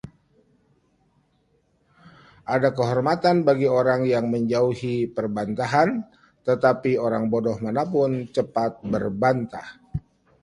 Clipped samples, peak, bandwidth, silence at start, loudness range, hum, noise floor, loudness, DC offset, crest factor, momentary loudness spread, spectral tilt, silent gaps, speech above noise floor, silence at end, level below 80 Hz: under 0.1%; -4 dBFS; 11 kHz; 0.05 s; 3 LU; none; -66 dBFS; -23 LUFS; under 0.1%; 20 dB; 13 LU; -7.5 dB/octave; none; 44 dB; 0.45 s; -54 dBFS